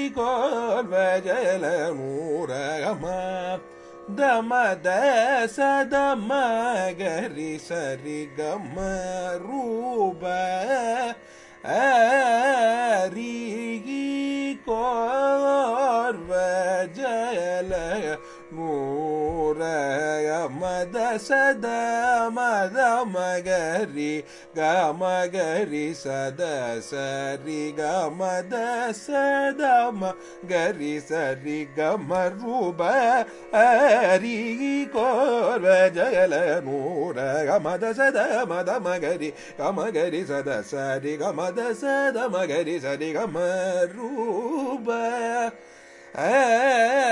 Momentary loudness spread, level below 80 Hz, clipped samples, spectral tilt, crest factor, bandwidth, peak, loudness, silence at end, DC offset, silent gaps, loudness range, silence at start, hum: 10 LU; -56 dBFS; under 0.1%; -4.5 dB/octave; 18 dB; 11.5 kHz; -6 dBFS; -24 LUFS; 0 s; under 0.1%; none; 6 LU; 0 s; none